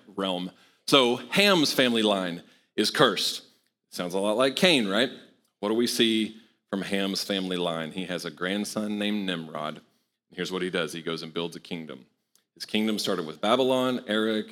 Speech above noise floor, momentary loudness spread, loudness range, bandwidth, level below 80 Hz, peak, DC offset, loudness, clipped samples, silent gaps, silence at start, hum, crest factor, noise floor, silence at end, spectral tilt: 35 dB; 14 LU; 8 LU; 18.5 kHz; -74 dBFS; -4 dBFS; under 0.1%; -26 LUFS; under 0.1%; none; 0.1 s; none; 24 dB; -61 dBFS; 0 s; -4 dB/octave